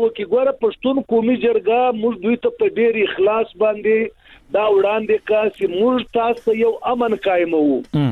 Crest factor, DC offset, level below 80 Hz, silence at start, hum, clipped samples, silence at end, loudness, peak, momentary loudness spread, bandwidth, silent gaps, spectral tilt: 10 dB; under 0.1%; -54 dBFS; 0 s; none; under 0.1%; 0 s; -18 LUFS; -6 dBFS; 3 LU; 4.3 kHz; none; -8 dB/octave